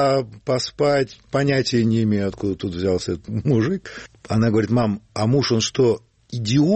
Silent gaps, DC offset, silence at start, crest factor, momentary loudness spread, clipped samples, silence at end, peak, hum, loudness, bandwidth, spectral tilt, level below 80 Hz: none; under 0.1%; 0 s; 14 dB; 8 LU; under 0.1%; 0 s; -6 dBFS; none; -21 LUFS; 8.8 kHz; -6 dB/octave; -50 dBFS